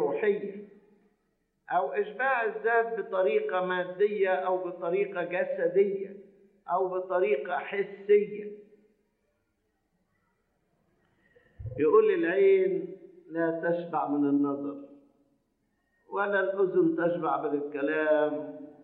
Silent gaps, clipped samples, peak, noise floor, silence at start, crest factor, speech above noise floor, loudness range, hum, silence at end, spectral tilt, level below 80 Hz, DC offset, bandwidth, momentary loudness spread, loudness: none; under 0.1%; -10 dBFS; -76 dBFS; 0 s; 18 dB; 49 dB; 5 LU; none; 0.1 s; -9.5 dB/octave; -66 dBFS; under 0.1%; 4.1 kHz; 13 LU; -28 LUFS